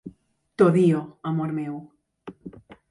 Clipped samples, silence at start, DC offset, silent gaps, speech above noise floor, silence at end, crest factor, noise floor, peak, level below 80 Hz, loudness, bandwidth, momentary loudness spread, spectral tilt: under 0.1%; 0.05 s; under 0.1%; none; 33 dB; 0.3 s; 18 dB; -54 dBFS; -6 dBFS; -64 dBFS; -23 LUFS; 11 kHz; 26 LU; -9 dB/octave